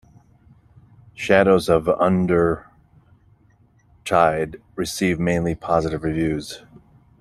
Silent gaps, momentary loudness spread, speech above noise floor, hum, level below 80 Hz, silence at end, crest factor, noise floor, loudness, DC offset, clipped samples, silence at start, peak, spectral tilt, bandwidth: none; 13 LU; 37 dB; none; -46 dBFS; 0.65 s; 20 dB; -57 dBFS; -20 LUFS; under 0.1%; under 0.1%; 1.2 s; -2 dBFS; -6 dB/octave; 14 kHz